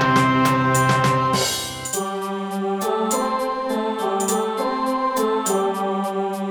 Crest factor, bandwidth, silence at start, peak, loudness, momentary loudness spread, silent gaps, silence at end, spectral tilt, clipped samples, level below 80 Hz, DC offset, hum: 16 dB; over 20 kHz; 0 s; -6 dBFS; -21 LUFS; 7 LU; none; 0 s; -4.5 dB/octave; under 0.1%; -54 dBFS; under 0.1%; none